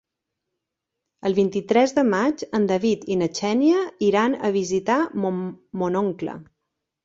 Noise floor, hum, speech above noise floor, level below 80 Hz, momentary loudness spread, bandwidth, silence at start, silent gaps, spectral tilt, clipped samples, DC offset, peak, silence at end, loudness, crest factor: -83 dBFS; none; 61 dB; -62 dBFS; 9 LU; 7.8 kHz; 1.25 s; none; -5.5 dB/octave; under 0.1%; under 0.1%; -4 dBFS; 0.6 s; -22 LUFS; 18 dB